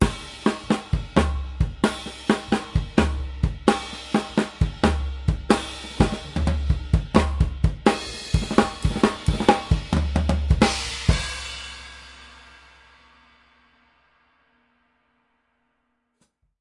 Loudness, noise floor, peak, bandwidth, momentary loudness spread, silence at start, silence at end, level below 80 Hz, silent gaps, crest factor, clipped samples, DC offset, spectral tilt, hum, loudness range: -24 LUFS; -73 dBFS; -2 dBFS; 11.5 kHz; 8 LU; 0 s; 4.2 s; -30 dBFS; none; 22 dB; under 0.1%; under 0.1%; -6 dB/octave; none; 5 LU